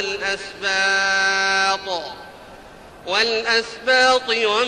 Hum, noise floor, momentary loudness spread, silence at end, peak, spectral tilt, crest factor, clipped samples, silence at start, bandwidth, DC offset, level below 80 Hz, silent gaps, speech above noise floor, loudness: none; -42 dBFS; 12 LU; 0 s; -4 dBFS; -0.5 dB/octave; 16 dB; under 0.1%; 0 s; 12.5 kHz; under 0.1%; -54 dBFS; none; 22 dB; -18 LUFS